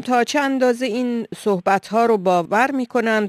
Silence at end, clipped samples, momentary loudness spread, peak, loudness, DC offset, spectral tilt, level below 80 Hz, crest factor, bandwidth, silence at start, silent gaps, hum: 0 s; under 0.1%; 5 LU; -4 dBFS; -19 LUFS; under 0.1%; -5 dB/octave; -66 dBFS; 16 dB; 14 kHz; 0 s; none; none